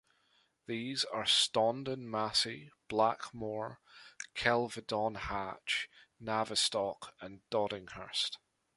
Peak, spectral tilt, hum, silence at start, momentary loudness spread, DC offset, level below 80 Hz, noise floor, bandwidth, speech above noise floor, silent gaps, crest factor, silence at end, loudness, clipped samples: -12 dBFS; -2.5 dB/octave; none; 0.7 s; 16 LU; under 0.1%; -64 dBFS; -73 dBFS; 11.5 kHz; 38 dB; none; 24 dB; 0.4 s; -34 LUFS; under 0.1%